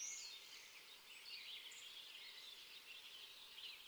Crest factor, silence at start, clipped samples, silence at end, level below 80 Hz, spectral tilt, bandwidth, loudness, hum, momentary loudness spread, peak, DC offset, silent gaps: 18 dB; 0 s; under 0.1%; 0 s; under -90 dBFS; 2.5 dB/octave; over 20 kHz; -54 LUFS; none; 5 LU; -38 dBFS; under 0.1%; none